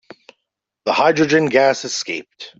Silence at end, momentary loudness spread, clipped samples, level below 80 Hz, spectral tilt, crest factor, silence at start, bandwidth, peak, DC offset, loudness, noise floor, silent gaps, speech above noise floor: 0.1 s; 13 LU; under 0.1%; -60 dBFS; -4 dB/octave; 16 dB; 0.85 s; 8 kHz; -2 dBFS; under 0.1%; -17 LUFS; -78 dBFS; none; 62 dB